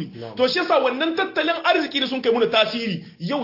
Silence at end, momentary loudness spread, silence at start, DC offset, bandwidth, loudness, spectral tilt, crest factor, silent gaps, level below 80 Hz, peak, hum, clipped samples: 0 s; 9 LU; 0 s; under 0.1%; 5.8 kHz; -21 LUFS; -5 dB/octave; 18 dB; none; -66 dBFS; -2 dBFS; none; under 0.1%